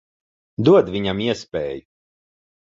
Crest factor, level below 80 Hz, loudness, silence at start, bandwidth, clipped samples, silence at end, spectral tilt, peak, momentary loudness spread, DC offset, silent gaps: 18 dB; -50 dBFS; -19 LUFS; 0.6 s; 7.8 kHz; under 0.1%; 0.9 s; -7 dB/octave; -2 dBFS; 17 LU; under 0.1%; none